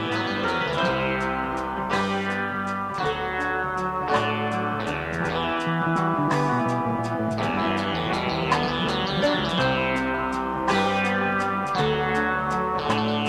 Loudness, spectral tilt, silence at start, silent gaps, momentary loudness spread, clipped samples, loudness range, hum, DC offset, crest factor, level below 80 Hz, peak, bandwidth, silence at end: -24 LUFS; -5.5 dB/octave; 0 s; none; 4 LU; under 0.1%; 2 LU; none; under 0.1%; 16 dB; -46 dBFS; -8 dBFS; 15 kHz; 0 s